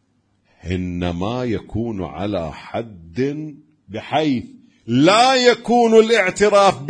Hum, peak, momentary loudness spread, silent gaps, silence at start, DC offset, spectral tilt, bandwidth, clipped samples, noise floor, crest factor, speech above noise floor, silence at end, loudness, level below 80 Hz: none; 0 dBFS; 17 LU; none; 0.65 s; under 0.1%; -5 dB/octave; 10.5 kHz; under 0.1%; -63 dBFS; 18 dB; 46 dB; 0 s; -17 LUFS; -46 dBFS